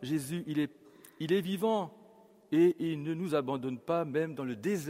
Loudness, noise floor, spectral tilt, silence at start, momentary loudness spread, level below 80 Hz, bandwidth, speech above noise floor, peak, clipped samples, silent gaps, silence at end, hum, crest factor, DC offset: -32 LUFS; -59 dBFS; -6.5 dB/octave; 0 s; 9 LU; -74 dBFS; 16 kHz; 28 dB; -16 dBFS; under 0.1%; none; 0 s; none; 16 dB; under 0.1%